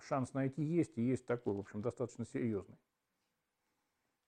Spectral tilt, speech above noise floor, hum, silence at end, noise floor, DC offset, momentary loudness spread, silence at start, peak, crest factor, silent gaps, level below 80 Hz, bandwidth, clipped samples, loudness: -8 dB/octave; 47 dB; none; 1.5 s; -86 dBFS; under 0.1%; 6 LU; 0 s; -22 dBFS; 18 dB; none; -78 dBFS; 10 kHz; under 0.1%; -39 LUFS